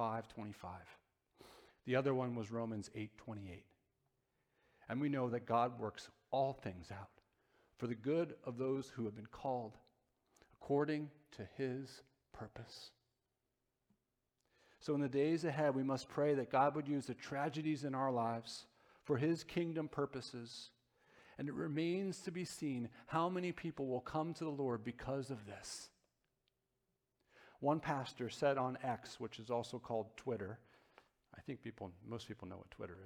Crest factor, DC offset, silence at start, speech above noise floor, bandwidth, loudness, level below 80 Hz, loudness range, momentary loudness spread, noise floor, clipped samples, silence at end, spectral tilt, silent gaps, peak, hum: 20 dB; under 0.1%; 0 s; 47 dB; 16 kHz; -41 LUFS; -74 dBFS; 8 LU; 16 LU; -88 dBFS; under 0.1%; 0 s; -6.5 dB/octave; none; -22 dBFS; none